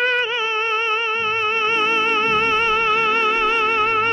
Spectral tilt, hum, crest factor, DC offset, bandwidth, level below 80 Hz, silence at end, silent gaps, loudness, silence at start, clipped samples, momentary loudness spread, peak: -2.5 dB/octave; none; 10 dB; under 0.1%; 10 kHz; -50 dBFS; 0 s; none; -17 LUFS; 0 s; under 0.1%; 3 LU; -8 dBFS